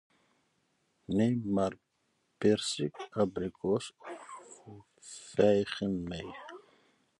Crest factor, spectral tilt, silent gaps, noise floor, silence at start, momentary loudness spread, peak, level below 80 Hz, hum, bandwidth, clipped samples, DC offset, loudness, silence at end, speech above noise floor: 22 dB; -5.5 dB/octave; none; -77 dBFS; 1.1 s; 21 LU; -12 dBFS; -62 dBFS; none; 11.5 kHz; under 0.1%; under 0.1%; -32 LUFS; 0.6 s; 45 dB